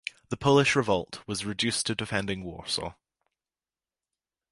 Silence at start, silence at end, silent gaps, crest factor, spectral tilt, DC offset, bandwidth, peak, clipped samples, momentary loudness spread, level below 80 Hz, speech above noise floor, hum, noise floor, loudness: 0.3 s; 1.6 s; none; 22 dB; -4 dB/octave; under 0.1%; 11.5 kHz; -8 dBFS; under 0.1%; 13 LU; -56 dBFS; over 62 dB; none; under -90 dBFS; -27 LUFS